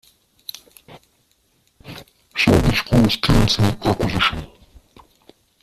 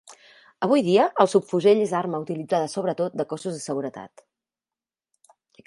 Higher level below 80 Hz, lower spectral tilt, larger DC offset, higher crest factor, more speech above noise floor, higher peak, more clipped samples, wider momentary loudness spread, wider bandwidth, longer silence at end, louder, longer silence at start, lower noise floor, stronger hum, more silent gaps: first, -32 dBFS vs -74 dBFS; about the same, -5.5 dB/octave vs -5.5 dB/octave; neither; about the same, 20 dB vs 22 dB; second, 44 dB vs over 68 dB; about the same, -2 dBFS vs -2 dBFS; neither; first, 23 LU vs 11 LU; first, 14.5 kHz vs 11.5 kHz; second, 1.15 s vs 1.6 s; first, -17 LUFS vs -23 LUFS; first, 0.9 s vs 0.1 s; second, -62 dBFS vs under -90 dBFS; neither; neither